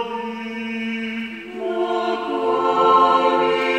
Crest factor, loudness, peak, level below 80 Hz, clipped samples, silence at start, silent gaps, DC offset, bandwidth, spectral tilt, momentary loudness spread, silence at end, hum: 16 dB; -20 LUFS; -4 dBFS; -68 dBFS; under 0.1%; 0 s; none; under 0.1%; 9.4 kHz; -5 dB/octave; 14 LU; 0 s; none